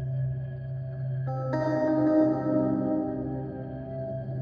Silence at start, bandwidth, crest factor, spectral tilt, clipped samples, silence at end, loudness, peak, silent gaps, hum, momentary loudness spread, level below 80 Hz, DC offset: 0 s; 6.2 kHz; 16 dB; -10.5 dB/octave; under 0.1%; 0 s; -29 LUFS; -12 dBFS; none; none; 12 LU; -52 dBFS; under 0.1%